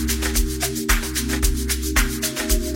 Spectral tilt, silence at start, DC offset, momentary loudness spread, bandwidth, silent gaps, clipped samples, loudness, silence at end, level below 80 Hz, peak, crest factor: -3 dB/octave; 0 s; under 0.1%; 3 LU; 16.5 kHz; none; under 0.1%; -22 LUFS; 0 s; -24 dBFS; -2 dBFS; 18 dB